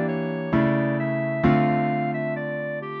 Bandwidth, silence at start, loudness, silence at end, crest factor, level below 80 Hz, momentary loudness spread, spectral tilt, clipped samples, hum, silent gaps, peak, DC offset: 5.2 kHz; 0 s; -24 LUFS; 0 s; 16 dB; -48 dBFS; 8 LU; -10 dB/octave; under 0.1%; none; none; -8 dBFS; under 0.1%